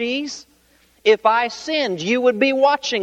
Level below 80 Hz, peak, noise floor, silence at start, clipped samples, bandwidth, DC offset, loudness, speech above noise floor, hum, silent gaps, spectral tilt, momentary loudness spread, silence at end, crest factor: -64 dBFS; -2 dBFS; -57 dBFS; 0 s; under 0.1%; 8.8 kHz; under 0.1%; -18 LUFS; 38 dB; none; none; -3.5 dB/octave; 9 LU; 0 s; 16 dB